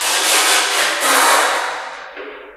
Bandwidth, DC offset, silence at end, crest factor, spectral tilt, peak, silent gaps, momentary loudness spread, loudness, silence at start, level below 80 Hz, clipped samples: 16 kHz; under 0.1%; 0 s; 16 dB; 2.5 dB/octave; 0 dBFS; none; 19 LU; -13 LUFS; 0 s; -62 dBFS; under 0.1%